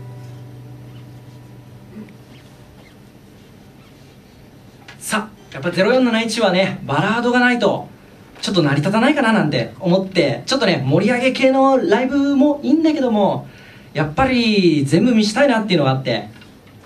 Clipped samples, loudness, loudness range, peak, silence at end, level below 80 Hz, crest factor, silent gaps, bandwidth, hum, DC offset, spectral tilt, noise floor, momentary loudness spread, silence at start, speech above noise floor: under 0.1%; -16 LUFS; 6 LU; 0 dBFS; 0.5 s; -50 dBFS; 18 dB; none; 14 kHz; none; under 0.1%; -5.5 dB/octave; -44 dBFS; 21 LU; 0 s; 28 dB